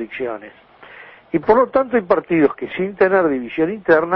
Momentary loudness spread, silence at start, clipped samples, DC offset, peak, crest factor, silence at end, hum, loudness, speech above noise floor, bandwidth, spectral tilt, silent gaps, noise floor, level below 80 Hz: 11 LU; 0 s; under 0.1%; under 0.1%; -2 dBFS; 16 dB; 0 s; none; -18 LUFS; 24 dB; 5.8 kHz; -9.5 dB/octave; none; -41 dBFS; -52 dBFS